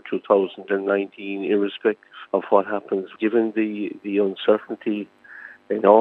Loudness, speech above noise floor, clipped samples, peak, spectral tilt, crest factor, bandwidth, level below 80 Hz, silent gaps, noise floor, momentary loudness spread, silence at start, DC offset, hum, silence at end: -23 LUFS; 22 dB; under 0.1%; -2 dBFS; -8.5 dB/octave; 20 dB; 4.1 kHz; -84 dBFS; none; -43 dBFS; 10 LU; 0.05 s; under 0.1%; none; 0 s